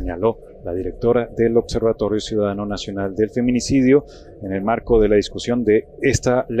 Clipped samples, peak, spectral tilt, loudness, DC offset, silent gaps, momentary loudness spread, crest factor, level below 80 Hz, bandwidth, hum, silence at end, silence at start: under 0.1%; -4 dBFS; -6 dB/octave; -19 LUFS; under 0.1%; none; 10 LU; 16 dB; -36 dBFS; 10 kHz; none; 0 s; 0 s